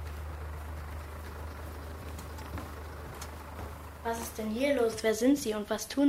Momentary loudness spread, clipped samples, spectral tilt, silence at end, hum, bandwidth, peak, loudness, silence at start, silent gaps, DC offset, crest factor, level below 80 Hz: 15 LU; under 0.1%; -5 dB/octave; 0 s; none; 16 kHz; -14 dBFS; -35 LUFS; 0 s; none; under 0.1%; 18 dB; -46 dBFS